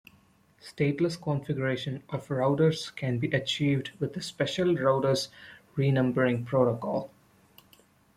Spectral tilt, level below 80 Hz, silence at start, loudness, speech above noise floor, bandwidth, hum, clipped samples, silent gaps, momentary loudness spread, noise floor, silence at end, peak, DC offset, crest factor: -6.5 dB/octave; -64 dBFS; 0.65 s; -28 LUFS; 35 dB; 14 kHz; none; under 0.1%; none; 10 LU; -62 dBFS; 1.1 s; -12 dBFS; under 0.1%; 18 dB